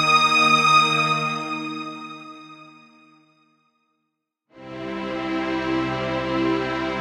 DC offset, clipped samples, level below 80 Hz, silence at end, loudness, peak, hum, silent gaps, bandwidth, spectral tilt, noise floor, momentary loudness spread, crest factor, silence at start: under 0.1%; under 0.1%; -54 dBFS; 0 s; -20 LUFS; -4 dBFS; none; none; 14.5 kHz; -3.5 dB/octave; -78 dBFS; 21 LU; 20 dB; 0 s